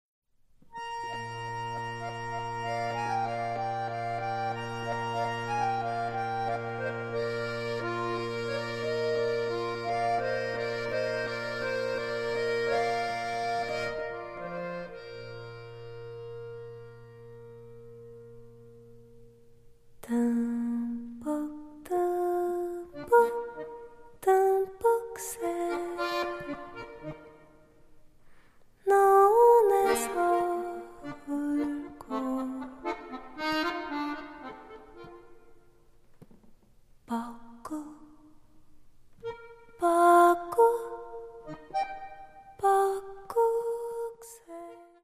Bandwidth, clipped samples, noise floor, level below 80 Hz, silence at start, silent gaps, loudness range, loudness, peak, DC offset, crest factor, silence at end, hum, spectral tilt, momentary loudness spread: 15.5 kHz; under 0.1%; -58 dBFS; -60 dBFS; 0.65 s; none; 18 LU; -29 LUFS; -10 dBFS; under 0.1%; 22 dB; 0.2 s; none; -5 dB/octave; 21 LU